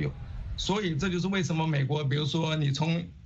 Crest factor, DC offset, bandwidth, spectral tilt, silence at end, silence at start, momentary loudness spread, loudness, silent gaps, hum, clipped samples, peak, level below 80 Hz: 14 dB; under 0.1%; 8 kHz; -6 dB/octave; 0.05 s; 0 s; 6 LU; -29 LUFS; none; none; under 0.1%; -14 dBFS; -46 dBFS